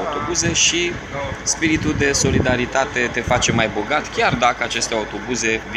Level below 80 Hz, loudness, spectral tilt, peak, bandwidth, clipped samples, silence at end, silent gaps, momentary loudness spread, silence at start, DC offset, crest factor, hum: -36 dBFS; -18 LUFS; -3 dB/octave; 0 dBFS; 13.5 kHz; under 0.1%; 0 s; none; 7 LU; 0 s; under 0.1%; 18 dB; none